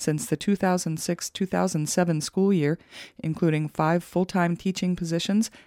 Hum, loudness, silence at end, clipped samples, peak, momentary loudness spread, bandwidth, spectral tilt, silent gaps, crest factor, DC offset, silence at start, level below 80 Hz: none; -25 LUFS; 0.1 s; under 0.1%; -10 dBFS; 5 LU; 16 kHz; -5.5 dB/octave; none; 16 dB; under 0.1%; 0 s; -60 dBFS